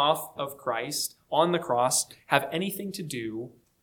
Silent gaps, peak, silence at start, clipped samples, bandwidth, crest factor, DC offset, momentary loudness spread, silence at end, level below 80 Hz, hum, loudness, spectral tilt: none; -4 dBFS; 0 s; under 0.1%; 19 kHz; 24 dB; under 0.1%; 10 LU; 0.35 s; -70 dBFS; none; -28 LUFS; -3 dB/octave